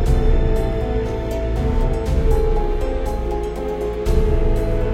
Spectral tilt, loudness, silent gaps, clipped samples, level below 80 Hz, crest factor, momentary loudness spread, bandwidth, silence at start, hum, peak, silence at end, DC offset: -7.5 dB/octave; -21 LUFS; none; under 0.1%; -18 dBFS; 14 dB; 5 LU; 11.5 kHz; 0 s; none; -4 dBFS; 0 s; under 0.1%